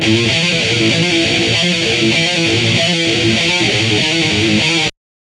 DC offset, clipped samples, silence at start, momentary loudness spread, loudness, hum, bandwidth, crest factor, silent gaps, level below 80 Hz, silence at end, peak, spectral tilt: under 0.1%; under 0.1%; 0 s; 1 LU; -12 LUFS; none; 12 kHz; 14 dB; none; -42 dBFS; 0.35 s; 0 dBFS; -3.5 dB/octave